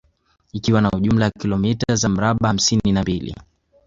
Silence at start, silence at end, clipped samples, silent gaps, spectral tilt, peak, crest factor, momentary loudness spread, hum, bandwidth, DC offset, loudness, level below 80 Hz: 0.55 s; 0.45 s; under 0.1%; none; -5 dB/octave; -2 dBFS; 16 dB; 10 LU; none; 7.8 kHz; under 0.1%; -19 LUFS; -40 dBFS